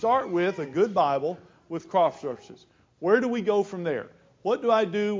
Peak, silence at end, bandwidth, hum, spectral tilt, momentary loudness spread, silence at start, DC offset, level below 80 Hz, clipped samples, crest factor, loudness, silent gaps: -8 dBFS; 0 s; 7.6 kHz; none; -6.5 dB/octave; 14 LU; 0 s; under 0.1%; -70 dBFS; under 0.1%; 18 dB; -26 LUFS; none